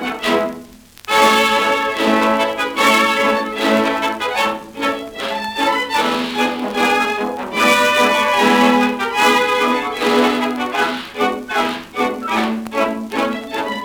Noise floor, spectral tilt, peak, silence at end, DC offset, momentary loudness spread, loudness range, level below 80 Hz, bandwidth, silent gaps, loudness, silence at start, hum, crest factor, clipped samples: -39 dBFS; -3 dB/octave; 0 dBFS; 0 s; under 0.1%; 9 LU; 4 LU; -52 dBFS; over 20 kHz; none; -16 LUFS; 0 s; none; 16 dB; under 0.1%